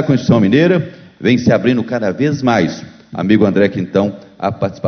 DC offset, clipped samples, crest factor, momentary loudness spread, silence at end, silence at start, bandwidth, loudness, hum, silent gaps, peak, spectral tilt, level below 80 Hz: under 0.1%; under 0.1%; 14 dB; 11 LU; 0 s; 0 s; 6.6 kHz; -14 LUFS; none; none; 0 dBFS; -7.5 dB/octave; -44 dBFS